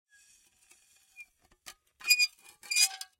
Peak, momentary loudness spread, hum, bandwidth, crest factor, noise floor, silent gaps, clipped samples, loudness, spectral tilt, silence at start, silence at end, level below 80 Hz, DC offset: -10 dBFS; 7 LU; none; 16.5 kHz; 26 dB; -64 dBFS; none; under 0.1%; -27 LUFS; 5.5 dB/octave; 1.2 s; 0.15 s; -80 dBFS; under 0.1%